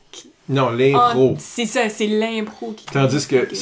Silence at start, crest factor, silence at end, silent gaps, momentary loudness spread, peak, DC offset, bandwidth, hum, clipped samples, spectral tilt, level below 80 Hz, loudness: 0.15 s; 14 dB; 0 s; none; 11 LU; -4 dBFS; under 0.1%; 8 kHz; none; under 0.1%; -5.5 dB/octave; -58 dBFS; -18 LUFS